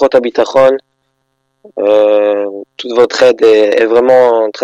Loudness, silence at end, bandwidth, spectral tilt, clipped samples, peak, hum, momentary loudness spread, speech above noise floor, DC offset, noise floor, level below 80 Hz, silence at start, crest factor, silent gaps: -9 LUFS; 0 s; 8.2 kHz; -4 dB/octave; under 0.1%; 0 dBFS; none; 11 LU; 55 dB; under 0.1%; -64 dBFS; -54 dBFS; 0 s; 10 dB; none